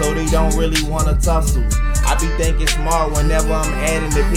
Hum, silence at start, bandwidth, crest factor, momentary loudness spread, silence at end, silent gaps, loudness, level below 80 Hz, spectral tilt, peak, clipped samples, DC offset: none; 0 s; 16 kHz; 12 dB; 2 LU; 0 s; none; -18 LUFS; -18 dBFS; -4.5 dB/octave; -2 dBFS; under 0.1%; under 0.1%